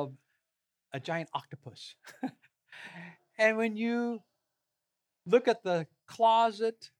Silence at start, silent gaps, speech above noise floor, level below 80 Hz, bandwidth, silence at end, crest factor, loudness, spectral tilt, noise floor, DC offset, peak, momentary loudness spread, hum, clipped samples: 0 s; none; 55 dB; -90 dBFS; 12 kHz; 0.15 s; 22 dB; -30 LUFS; -5.5 dB/octave; -86 dBFS; under 0.1%; -12 dBFS; 21 LU; none; under 0.1%